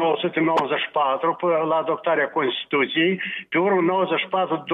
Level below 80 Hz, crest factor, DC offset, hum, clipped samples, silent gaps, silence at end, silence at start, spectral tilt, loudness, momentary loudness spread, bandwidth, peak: -74 dBFS; 12 dB; under 0.1%; none; under 0.1%; none; 0 s; 0 s; -6.5 dB/octave; -22 LUFS; 4 LU; 7.2 kHz; -8 dBFS